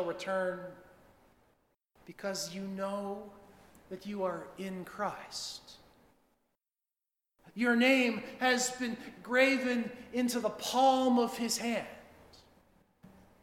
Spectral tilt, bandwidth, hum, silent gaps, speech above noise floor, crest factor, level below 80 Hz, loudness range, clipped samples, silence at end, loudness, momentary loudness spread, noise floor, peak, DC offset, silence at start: -3 dB/octave; 16.5 kHz; none; none; over 58 dB; 22 dB; -72 dBFS; 12 LU; under 0.1%; 0.35 s; -32 LUFS; 18 LU; under -90 dBFS; -12 dBFS; under 0.1%; 0 s